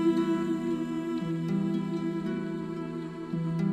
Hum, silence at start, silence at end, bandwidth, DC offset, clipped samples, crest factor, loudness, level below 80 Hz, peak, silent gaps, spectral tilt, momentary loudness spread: none; 0 s; 0 s; 9.6 kHz; under 0.1%; under 0.1%; 14 dB; -31 LUFS; -62 dBFS; -16 dBFS; none; -8 dB/octave; 7 LU